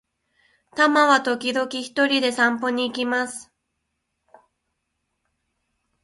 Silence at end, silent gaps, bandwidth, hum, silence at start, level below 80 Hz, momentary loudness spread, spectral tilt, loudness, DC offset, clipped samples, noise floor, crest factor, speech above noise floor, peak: 2.6 s; none; 11.5 kHz; none; 0.75 s; -70 dBFS; 10 LU; -2 dB/octave; -21 LUFS; under 0.1%; under 0.1%; -77 dBFS; 22 dB; 56 dB; -2 dBFS